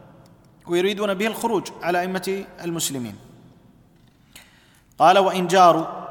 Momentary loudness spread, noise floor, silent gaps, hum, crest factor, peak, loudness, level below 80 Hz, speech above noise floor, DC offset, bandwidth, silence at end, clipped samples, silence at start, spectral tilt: 14 LU; -55 dBFS; none; none; 20 dB; -4 dBFS; -20 LUFS; -62 dBFS; 35 dB; under 0.1%; 19 kHz; 0 s; under 0.1%; 0.65 s; -4 dB/octave